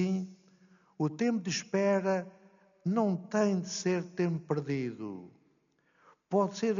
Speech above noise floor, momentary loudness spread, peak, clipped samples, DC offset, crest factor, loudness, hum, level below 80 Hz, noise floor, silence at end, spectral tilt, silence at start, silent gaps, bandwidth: 41 dB; 10 LU; -16 dBFS; under 0.1%; under 0.1%; 16 dB; -32 LUFS; none; -78 dBFS; -71 dBFS; 0 s; -6 dB/octave; 0 s; none; 7.2 kHz